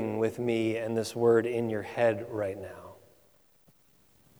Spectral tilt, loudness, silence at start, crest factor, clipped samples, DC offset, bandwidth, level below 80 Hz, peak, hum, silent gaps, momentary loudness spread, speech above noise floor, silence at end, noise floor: -6.5 dB/octave; -29 LUFS; 0 s; 18 dB; under 0.1%; under 0.1%; over 20 kHz; -70 dBFS; -12 dBFS; none; none; 12 LU; 36 dB; 1.45 s; -65 dBFS